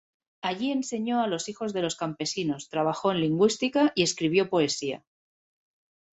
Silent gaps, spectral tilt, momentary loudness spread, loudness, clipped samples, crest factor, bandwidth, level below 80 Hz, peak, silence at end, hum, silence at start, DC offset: none; -4.5 dB/octave; 8 LU; -27 LUFS; under 0.1%; 20 dB; 8.2 kHz; -68 dBFS; -8 dBFS; 1.2 s; none; 0.45 s; under 0.1%